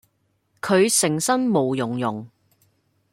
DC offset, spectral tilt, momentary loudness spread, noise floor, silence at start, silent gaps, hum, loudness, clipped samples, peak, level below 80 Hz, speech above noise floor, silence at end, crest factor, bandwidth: under 0.1%; -4 dB/octave; 12 LU; -69 dBFS; 0.65 s; none; none; -20 LUFS; under 0.1%; -6 dBFS; -66 dBFS; 48 dB; 0.85 s; 18 dB; 16.5 kHz